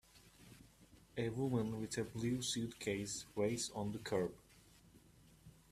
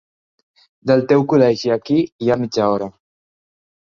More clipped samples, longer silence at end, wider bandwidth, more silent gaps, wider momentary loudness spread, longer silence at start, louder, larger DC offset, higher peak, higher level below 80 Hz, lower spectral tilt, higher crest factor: neither; second, 0.2 s vs 1.05 s; first, 15 kHz vs 7.4 kHz; second, none vs 2.12-2.19 s; first, 22 LU vs 8 LU; second, 0.15 s vs 0.85 s; second, -41 LUFS vs -17 LUFS; neither; second, -24 dBFS vs 0 dBFS; second, -68 dBFS vs -56 dBFS; second, -4.5 dB/octave vs -7 dB/octave; about the same, 20 dB vs 18 dB